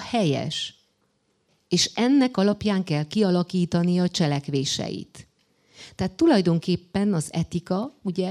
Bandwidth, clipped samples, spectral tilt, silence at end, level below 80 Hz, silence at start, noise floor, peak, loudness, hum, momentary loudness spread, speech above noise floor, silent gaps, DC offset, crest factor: 12.5 kHz; under 0.1%; -5.5 dB/octave; 0 s; -56 dBFS; 0 s; -69 dBFS; -8 dBFS; -24 LUFS; none; 10 LU; 46 dB; none; under 0.1%; 16 dB